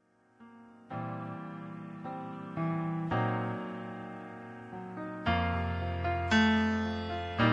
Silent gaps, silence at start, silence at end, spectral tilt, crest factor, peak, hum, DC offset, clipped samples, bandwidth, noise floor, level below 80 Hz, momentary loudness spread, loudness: none; 0.4 s; 0 s; -6.5 dB/octave; 20 dB; -14 dBFS; none; under 0.1%; under 0.1%; 8 kHz; -59 dBFS; -52 dBFS; 16 LU; -33 LUFS